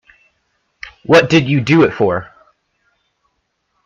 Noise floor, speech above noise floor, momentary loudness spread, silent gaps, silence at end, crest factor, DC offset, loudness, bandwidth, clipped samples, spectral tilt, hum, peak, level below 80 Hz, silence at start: -68 dBFS; 56 dB; 22 LU; none; 1.6 s; 16 dB; under 0.1%; -13 LUFS; 9.6 kHz; under 0.1%; -6.5 dB/octave; none; 0 dBFS; -50 dBFS; 0.85 s